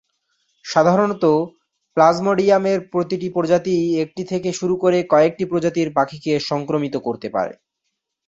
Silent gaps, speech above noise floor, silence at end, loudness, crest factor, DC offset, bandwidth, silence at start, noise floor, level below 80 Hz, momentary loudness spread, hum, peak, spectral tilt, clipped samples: none; 59 dB; 0.75 s; -19 LUFS; 18 dB; under 0.1%; 7.8 kHz; 0.65 s; -77 dBFS; -60 dBFS; 9 LU; none; -2 dBFS; -6 dB/octave; under 0.1%